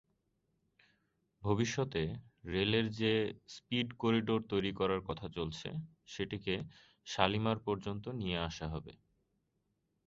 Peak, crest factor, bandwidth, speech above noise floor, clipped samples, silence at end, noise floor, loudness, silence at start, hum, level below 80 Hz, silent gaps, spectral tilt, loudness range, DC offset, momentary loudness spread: -10 dBFS; 26 dB; 7.6 kHz; 45 dB; under 0.1%; 1.15 s; -81 dBFS; -36 LUFS; 1.4 s; none; -58 dBFS; none; -4.5 dB/octave; 3 LU; under 0.1%; 12 LU